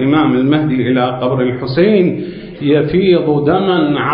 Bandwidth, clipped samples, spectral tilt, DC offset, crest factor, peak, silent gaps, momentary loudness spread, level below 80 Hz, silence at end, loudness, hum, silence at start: 5.4 kHz; under 0.1%; -13 dB/octave; under 0.1%; 12 dB; 0 dBFS; none; 5 LU; -44 dBFS; 0 s; -13 LUFS; none; 0 s